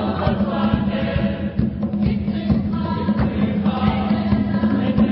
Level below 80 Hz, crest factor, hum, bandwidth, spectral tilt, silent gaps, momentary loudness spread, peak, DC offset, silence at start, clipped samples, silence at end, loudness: -32 dBFS; 16 dB; none; 5.6 kHz; -12.5 dB/octave; none; 3 LU; -4 dBFS; under 0.1%; 0 s; under 0.1%; 0 s; -20 LUFS